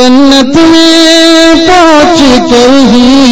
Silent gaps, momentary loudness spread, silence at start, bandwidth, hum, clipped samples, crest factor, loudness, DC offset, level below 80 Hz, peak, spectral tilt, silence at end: none; 2 LU; 0 s; 11 kHz; none; 20%; 2 dB; -2 LUFS; 10%; -26 dBFS; 0 dBFS; -3.5 dB/octave; 0 s